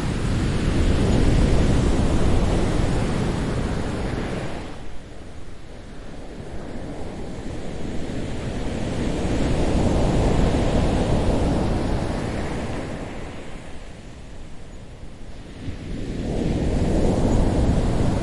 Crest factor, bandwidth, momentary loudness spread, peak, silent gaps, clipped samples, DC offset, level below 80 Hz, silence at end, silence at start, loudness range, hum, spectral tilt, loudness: 16 dB; 11.5 kHz; 20 LU; -6 dBFS; none; under 0.1%; under 0.1%; -26 dBFS; 0 s; 0 s; 13 LU; none; -7 dB/octave; -24 LUFS